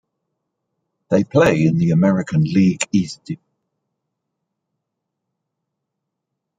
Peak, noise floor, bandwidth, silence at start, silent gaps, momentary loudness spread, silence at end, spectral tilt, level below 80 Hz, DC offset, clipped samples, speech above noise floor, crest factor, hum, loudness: -2 dBFS; -79 dBFS; 9.4 kHz; 1.1 s; none; 15 LU; 3.25 s; -6.5 dB/octave; -54 dBFS; under 0.1%; under 0.1%; 63 dB; 18 dB; none; -17 LUFS